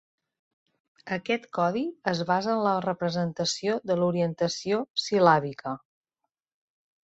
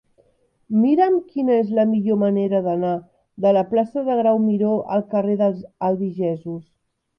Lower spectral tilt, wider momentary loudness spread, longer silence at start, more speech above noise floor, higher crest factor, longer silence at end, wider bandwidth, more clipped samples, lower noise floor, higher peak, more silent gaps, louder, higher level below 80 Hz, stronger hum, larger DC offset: second, -5 dB/octave vs -10.5 dB/octave; first, 12 LU vs 7 LU; first, 1.05 s vs 0.7 s; first, 58 dB vs 42 dB; first, 22 dB vs 14 dB; first, 1.25 s vs 0.55 s; first, 8.2 kHz vs 5.6 kHz; neither; first, -84 dBFS vs -61 dBFS; about the same, -6 dBFS vs -6 dBFS; first, 4.90-4.94 s vs none; second, -27 LUFS vs -20 LUFS; about the same, -68 dBFS vs -66 dBFS; neither; neither